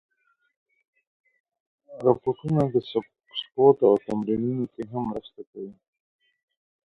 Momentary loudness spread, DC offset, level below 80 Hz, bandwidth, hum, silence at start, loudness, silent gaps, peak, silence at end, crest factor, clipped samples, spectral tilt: 20 LU; under 0.1%; -62 dBFS; 4.7 kHz; none; 1.9 s; -24 LUFS; 5.47-5.53 s; -4 dBFS; 1.2 s; 22 dB; under 0.1%; -9 dB/octave